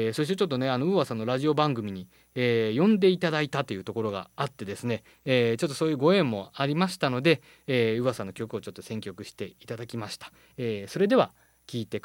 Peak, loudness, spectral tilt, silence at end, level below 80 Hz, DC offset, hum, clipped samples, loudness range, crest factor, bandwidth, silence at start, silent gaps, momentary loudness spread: -8 dBFS; -27 LUFS; -6 dB/octave; 0.05 s; -68 dBFS; under 0.1%; none; under 0.1%; 5 LU; 20 dB; 17 kHz; 0 s; none; 15 LU